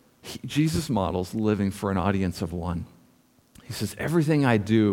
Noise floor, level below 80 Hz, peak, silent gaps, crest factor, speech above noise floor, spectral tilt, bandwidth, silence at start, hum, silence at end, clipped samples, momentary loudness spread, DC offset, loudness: -61 dBFS; -48 dBFS; -6 dBFS; none; 18 dB; 36 dB; -6.5 dB/octave; 17 kHz; 0.25 s; none; 0 s; under 0.1%; 14 LU; under 0.1%; -26 LUFS